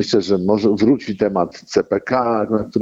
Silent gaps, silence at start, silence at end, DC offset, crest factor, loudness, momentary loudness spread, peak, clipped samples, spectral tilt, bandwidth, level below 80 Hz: none; 0 s; 0 s; under 0.1%; 14 dB; -18 LUFS; 5 LU; -4 dBFS; under 0.1%; -6.5 dB/octave; 8 kHz; -52 dBFS